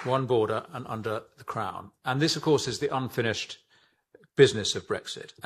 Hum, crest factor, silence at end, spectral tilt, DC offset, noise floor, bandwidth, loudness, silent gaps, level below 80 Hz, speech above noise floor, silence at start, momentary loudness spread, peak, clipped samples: none; 24 dB; 0.15 s; -4.5 dB/octave; under 0.1%; -63 dBFS; 14 kHz; -28 LUFS; none; -66 dBFS; 36 dB; 0 s; 14 LU; -4 dBFS; under 0.1%